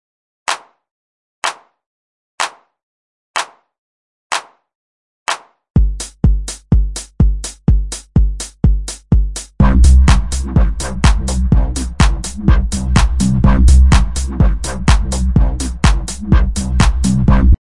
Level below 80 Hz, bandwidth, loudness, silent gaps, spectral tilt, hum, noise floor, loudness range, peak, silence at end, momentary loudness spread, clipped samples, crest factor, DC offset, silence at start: -16 dBFS; 11.5 kHz; -15 LUFS; 0.91-1.42 s, 1.86-2.38 s, 2.83-3.34 s, 3.78-4.30 s, 4.75-5.26 s, 5.70-5.74 s; -5.5 dB/octave; none; under -90 dBFS; 12 LU; 0 dBFS; 0.1 s; 11 LU; under 0.1%; 14 dB; under 0.1%; 0.5 s